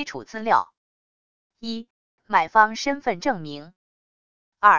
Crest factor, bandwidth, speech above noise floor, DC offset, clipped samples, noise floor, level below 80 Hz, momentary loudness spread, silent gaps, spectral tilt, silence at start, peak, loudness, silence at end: 22 dB; 7.4 kHz; over 67 dB; 0.3%; under 0.1%; under -90 dBFS; -66 dBFS; 18 LU; 0.77-1.50 s, 1.90-2.18 s, 3.76-4.52 s; -3.5 dB/octave; 0 s; -2 dBFS; -23 LUFS; 0 s